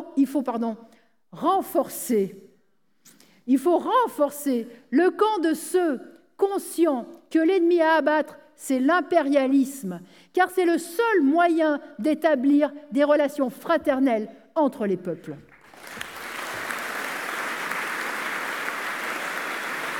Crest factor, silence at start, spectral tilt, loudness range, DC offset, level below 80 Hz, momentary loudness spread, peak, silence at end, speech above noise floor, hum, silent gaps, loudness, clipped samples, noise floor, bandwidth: 16 dB; 0 s; -4.5 dB/octave; 7 LU; under 0.1%; -74 dBFS; 12 LU; -8 dBFS; 0 s; 47 dB; none; none; -24 LUFS; under 0.1%; -69 dBFS; 19.5 kHz